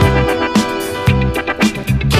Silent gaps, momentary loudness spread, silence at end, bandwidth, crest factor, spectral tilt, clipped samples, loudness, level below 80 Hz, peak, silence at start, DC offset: none; 3 LU; 0 s; 15.5 kHz; 14 dB; -5.5 dB/octave; under 0.1%; -15 LUFS; -24 dBFS; 0 dBFS; 0 s; under 0.1%